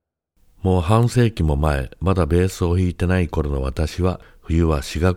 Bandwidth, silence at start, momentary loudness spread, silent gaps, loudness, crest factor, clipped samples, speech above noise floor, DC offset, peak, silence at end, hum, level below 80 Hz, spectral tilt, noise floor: 15 kHz; 0.65 s; 7 LU; none; -20 LUFS; 18 dB; under 0.1%; 41 dB; under 0.1%; -2 dBFS; 0 s; none; -28 dBFS; -7 dB/octave; -60 dBFS